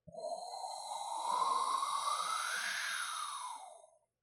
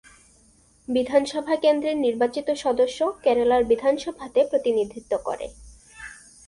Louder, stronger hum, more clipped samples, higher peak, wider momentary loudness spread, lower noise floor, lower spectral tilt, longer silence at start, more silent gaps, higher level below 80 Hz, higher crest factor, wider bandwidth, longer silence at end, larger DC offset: second, -37 LUFS vs -23 LUFS; neither; neither; second, -24 dBFS vs -6 dBFS; second, 10 LU vs 17 LU; first, -62 dBFS vs -57 dBFS; second, 1 dB/octave vs -4 dB/octave; second, 0.05 s vs 0.9 s; neither; second, -88 dBFS vs -54 dBFS; about the same, 16 dB vs 18 dB; first, 16 kHz vs 11.5 kHz; about the same, 0.35 s vs 0.35 s; neither